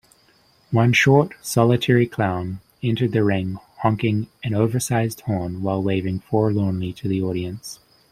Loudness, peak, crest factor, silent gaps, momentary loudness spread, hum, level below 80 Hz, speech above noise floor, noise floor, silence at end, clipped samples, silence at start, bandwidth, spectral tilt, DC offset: -21 LUFS; -2 dBFS; 18 dB; none; 11 LU; none; -54 dBFS; 37 dB; -58 dBFS; 0.35 s; under 0.1%; 0.7 s; 15.5 kHz; -6 dB/octave; under 0.1%